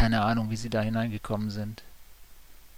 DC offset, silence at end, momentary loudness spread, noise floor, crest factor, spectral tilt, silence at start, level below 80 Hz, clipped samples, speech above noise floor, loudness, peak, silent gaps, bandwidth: 0.2%; 0.1 s; 12 LU; -50 dBFS; 18 dB; -6.5 dB/octave; 0 s; -46 dBFS; under 0.1%; 21 dB; -30 LUFS; -10 dBFS; none; 16 kHz